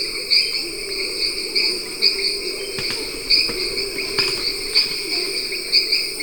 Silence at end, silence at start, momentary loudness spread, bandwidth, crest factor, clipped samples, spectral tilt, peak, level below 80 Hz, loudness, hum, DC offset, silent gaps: 0 s; 0 s; 7 LU; 19.5 kHz; 20 dB; under 0.1%; -0.5 dB/octave; -2 dBFS; -46 dBFS; -19 LUFS; none; 0.6%; none